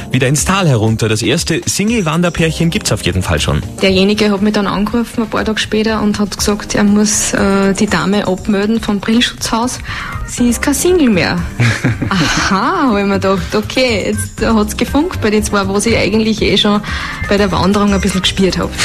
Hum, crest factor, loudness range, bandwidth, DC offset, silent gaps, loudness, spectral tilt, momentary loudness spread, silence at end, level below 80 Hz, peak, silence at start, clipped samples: none; 12 dB; 1 LU; 14.5 kHz; under 0.1%; none; -13 LUFS; -4.5 dB/octave; 5 LU; 0 s; -28 dBFS; 0 dBFS; 0 s; under 0.1%